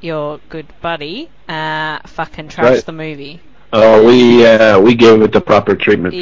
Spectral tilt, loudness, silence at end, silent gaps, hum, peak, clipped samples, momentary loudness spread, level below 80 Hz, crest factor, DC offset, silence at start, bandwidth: -6 dB/octave; -9 LUFS; 0 s; none; none; 0 dBFS; under 0.1%; 19 LU; -42 dBFS; 10 dB; 1%; 0.05 s; 7.6 kHz